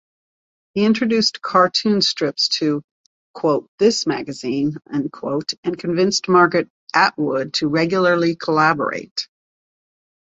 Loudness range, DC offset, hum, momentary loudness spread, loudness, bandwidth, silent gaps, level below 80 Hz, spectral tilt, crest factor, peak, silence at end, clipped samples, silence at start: 4 LU; under 0.1%; none; 9 LU; -19 LUFS; 8 kHz; 2.84-3.34 s, 3.68-3.78 s, 5.58-5.63 s, 6.70-6.87 s, 9.11-9.16 s; -62 dBFS; -4.5 dB/octave; 18 dB; -2 dBFS; 1.05 s; under 0.1%; 0.75 s